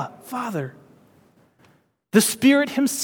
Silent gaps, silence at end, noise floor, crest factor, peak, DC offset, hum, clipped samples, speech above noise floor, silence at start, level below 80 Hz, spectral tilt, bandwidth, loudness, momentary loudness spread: none; 0 s; -59 dBFS; 22 dB; -2 dBFS; under 0.1%; none; under 0.1%; 39 dB; 0 s; -70 dBFS; -4 dB/octave; 19.5 kHz; -21 LUFS; 14 LU